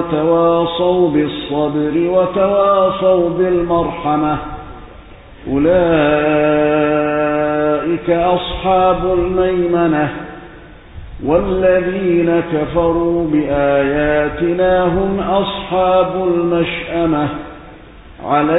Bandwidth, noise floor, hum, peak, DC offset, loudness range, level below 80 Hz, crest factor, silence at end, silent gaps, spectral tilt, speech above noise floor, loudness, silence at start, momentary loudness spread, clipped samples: 4 kHz; -37 dBFS; none; -2 dBFS; under 0.1%; 2 LU; -36 dBFS; 14 dB; 0 s; none; -12 dB/octave; 23 dB; -15 LUFS; 0 s; 6 LU; under 0.1%